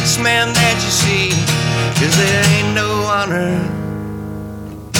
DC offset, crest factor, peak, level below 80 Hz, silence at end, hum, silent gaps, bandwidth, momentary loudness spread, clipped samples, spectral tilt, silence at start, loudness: under 0.1%; 12 dB; -4 dBFS; -38 dBFS; 0 s; none; none; 18 kHz; 14 LU; under 0.1%; -3.5 dB/octave; 0 s; -14 LUFS